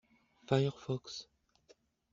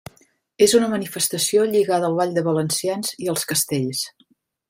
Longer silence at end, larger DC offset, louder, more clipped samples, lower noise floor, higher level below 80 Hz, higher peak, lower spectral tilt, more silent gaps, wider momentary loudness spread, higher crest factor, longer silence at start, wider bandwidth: first, 0.9 s vs 0.6 s; neither; second, -36 LUFS vs -20 LUFS; neither; first, -68 dBFS vs -61 dBFS; second, -72 dBFS vs -62 dBFS; second, -14 dBFS vs -4 dBFS; first, -6 dB/octave vs -3.5 dB/octave; neither; first, 14 LU vs 8 LU; first, 24 dB vs 18 dB; about the same, 0.5 s vs 0.6 s; second, 7.6 kHz vs 16.5 kHz